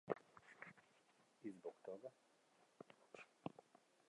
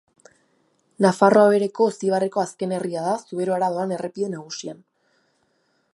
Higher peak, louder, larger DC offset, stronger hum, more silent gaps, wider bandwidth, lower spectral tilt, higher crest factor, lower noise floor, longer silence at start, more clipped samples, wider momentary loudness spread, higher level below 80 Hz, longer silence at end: second, -26 dBFS vs -2 dBFS; second, -57 LUFS vs -21 LUFS; neither; neither; neither; about the same, 11 kHz vs 11.5 kHz; about the same, -6.5 dB/octave vs -6 dB/octave; first, 32 dB vs 20 dB; first, -77 dBFS vs -68 dBFS; second, 0.05 s vs 1 s; neither; about the same, 14 LU vs 14 LU; second, under -90 dBFS vs -74 dBFS; second, 0.45 s vs 1.2 s